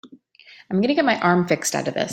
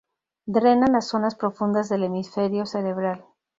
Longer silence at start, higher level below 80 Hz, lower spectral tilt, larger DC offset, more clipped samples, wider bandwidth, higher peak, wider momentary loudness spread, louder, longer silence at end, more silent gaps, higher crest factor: second, 0.05 s vs 0.45 s; about the same, -64 dBFS vs -60 dBFS; second, -4.5 dB/octave vs -6.5 dB/octave; neither; neither; first, 16.5 kHz vs 7.8 kHz; first, -2 dBFS vs -6 dBFS; second, 6 LU vs 9 LU; first, -20 LUFS vs -23 LUFS; second, 0 s vs 0.35 s; neither; about the same, 20 dB vs 18 dB